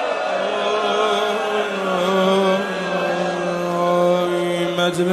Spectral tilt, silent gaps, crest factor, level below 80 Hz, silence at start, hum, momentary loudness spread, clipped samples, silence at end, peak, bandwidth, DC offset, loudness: -5 dB/octave; none; 14 dB; -62 dBFS; 0 s; none; 5 LU; under 0.1%; 0 s; -4 dBFS; 13.5 kHz; under 0.1%; -19 LUFS